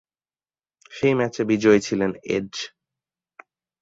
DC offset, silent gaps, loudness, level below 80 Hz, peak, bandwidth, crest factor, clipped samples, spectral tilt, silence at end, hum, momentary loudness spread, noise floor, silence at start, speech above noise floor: under 0.1%; none; -22 LUFS; -58 dBFS; -4 dBFS; 7.8 kHz; 20 dB; under 0.1%; -5.5 dB/octave; 1.15 s; none; 15 LU; under -90 dBFS; 0.9 s; over 69 dB